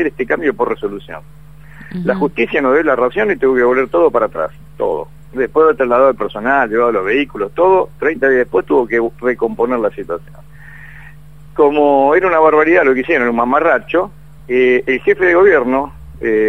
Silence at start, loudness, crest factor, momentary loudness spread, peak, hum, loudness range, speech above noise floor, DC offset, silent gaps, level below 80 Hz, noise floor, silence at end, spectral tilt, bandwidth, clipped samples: 0 s; -14 LUFS; 14 dB; 12 LU; 0 dBFS; none; 4 LU; 25 dB; 1%; none; -44 dBFS; -38 dBFS; 0 s; -7.5 dB/octave; 6.4 kHz; under 0.1%